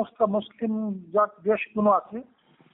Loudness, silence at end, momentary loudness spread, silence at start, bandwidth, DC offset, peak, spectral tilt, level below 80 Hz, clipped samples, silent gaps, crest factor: -25 LUFS; 0.5 s; 8 LU; 0 s; 3.9 kHz; under 0.1%; -10 dBFS; -6 dB/octave; -70 dBFS; under 0.1%; none; 16 dB